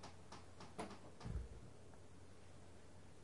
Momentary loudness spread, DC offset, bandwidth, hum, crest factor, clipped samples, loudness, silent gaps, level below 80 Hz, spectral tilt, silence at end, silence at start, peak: 12 LU; 0.1%; 11.5 kHz; none; 20 dB; under 0.1%; -57 LUFS; none; -60 dBFS; -5.5 dB/octave; 0 s; 0 s; -34 dBFS